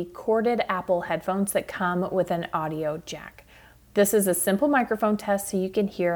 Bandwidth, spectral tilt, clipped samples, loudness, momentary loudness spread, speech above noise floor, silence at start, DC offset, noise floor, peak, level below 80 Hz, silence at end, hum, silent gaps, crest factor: over 20 kHz; -5 dB/octave; under 0.1%; -25 LUFS; 8 LU; 28 dB; 0 s; under 0.1%; -53 dBFS; -10 dBFS; -58 dBFS; 0 s; none; none; 16 dB